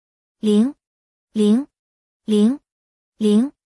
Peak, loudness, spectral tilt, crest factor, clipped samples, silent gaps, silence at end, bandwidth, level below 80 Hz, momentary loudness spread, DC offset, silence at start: -6 dBFS; -19 LUFS; -7 dB/octave; 14 dB; under 0.1%; 0.87-1.28 s, 1.79-2.20 s, 2.72-3.13 s; 0.2 s; 12 kHz; -68 dBFS; 12 LU; under 0.1%; 0.45 s